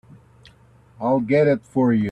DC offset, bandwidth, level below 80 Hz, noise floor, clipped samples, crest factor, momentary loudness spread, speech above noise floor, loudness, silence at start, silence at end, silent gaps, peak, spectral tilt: under 0.1%; 9.4 kHz; -58 dBFS; -52 dBFS; under 0.1%; 14 dB; 5 LU; 33 dB; -20 LUFS; 1 s; 0 s; none; -8 dBFS; -9 dB/octave